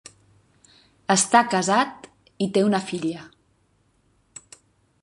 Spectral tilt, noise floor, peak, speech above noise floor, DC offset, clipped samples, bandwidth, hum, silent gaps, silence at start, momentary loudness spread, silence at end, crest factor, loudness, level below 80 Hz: -3.5 dB/octave; -65 dBFS; -2 dBFS; 44 dB; under 0.1%; under 0.1%; 11.5 kHz; none; none; 1.1 s; 26 LU; 1.75 s; 24 dB; -21 LUFS; -68 dBFS